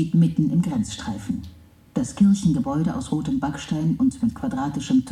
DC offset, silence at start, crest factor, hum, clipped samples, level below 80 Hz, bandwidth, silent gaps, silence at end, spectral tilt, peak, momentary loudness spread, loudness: under 0.1%; 0 s; 14 dB; none; under 0.1%; -46 dBFS; 11.5 kHz; none; 0 s; -7 dB/octave; -8 dBFS; 11 LU; -23 LUFS